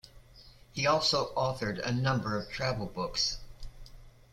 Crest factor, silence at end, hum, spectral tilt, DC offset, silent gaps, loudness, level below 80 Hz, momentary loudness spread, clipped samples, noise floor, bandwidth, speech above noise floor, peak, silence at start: 20 dB; 0.2 s; none; -4 dB/octave; under 0.1%; none; -31 LUFS; -50 dBFS; 15 LU; under 0.1%; -55 dBFS; 14 kHz; 24 dB; -14 dBFS; 0.05 s